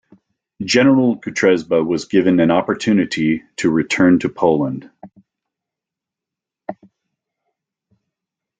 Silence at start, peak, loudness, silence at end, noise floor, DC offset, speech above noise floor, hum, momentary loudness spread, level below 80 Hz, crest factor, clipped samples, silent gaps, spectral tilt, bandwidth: 0.6 s; -2 dBFS; -16 LUFS; 1.85 s; -86 dBFS; under 0.1%; 70 dB; none; 16 LU; -58 dBFS; 16 dB; under 0.1%; none; -5.5 dB/octave; 9.2 kHz